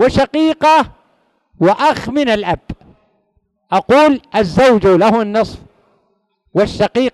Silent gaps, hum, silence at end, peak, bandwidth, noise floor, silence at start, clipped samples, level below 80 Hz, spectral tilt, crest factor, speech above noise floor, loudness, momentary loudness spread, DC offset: none; none; 0.05 s; 0 dBFS; 12 kHz; -62 dBFS; 0 s; under 0.1%; -40 dBFS; -6 dB/octave; 14 dB; 50 dB; -13 LUFS; 11 LU; under 0.1%